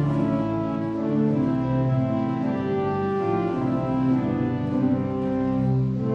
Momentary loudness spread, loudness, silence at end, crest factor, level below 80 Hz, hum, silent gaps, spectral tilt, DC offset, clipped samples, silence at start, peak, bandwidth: 3 LU; -24 LUFS; 0 s; 12 dB; -48 dBFS; none; none; -10 dB/octave; under 0.1%; under 0.1%; 0 s; -12 dBFS; 6.4 kHz